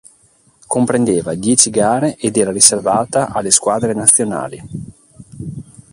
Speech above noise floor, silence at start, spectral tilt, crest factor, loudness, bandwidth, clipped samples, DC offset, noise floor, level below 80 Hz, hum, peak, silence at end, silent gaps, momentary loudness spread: 38 dB; 0.7 s; -3.5 dB/octave; 16 dB; -13 LUFS; 16 kHz; 0.1%; under 0.1%; -53 dBFS; -48 dBFS; none; 0 dBFS; 0.3 s; none; 20 LU